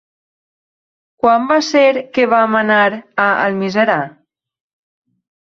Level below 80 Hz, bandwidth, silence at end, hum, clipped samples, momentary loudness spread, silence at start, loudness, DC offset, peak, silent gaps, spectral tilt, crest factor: -60 dBFS; 7.6 kHz; 1.3 s; none; under 0.1%; 5 LU; 1.25 s; -14 LUFS; under 0.1%; 0 dBFS; none; -5 dB/octave; 16 dB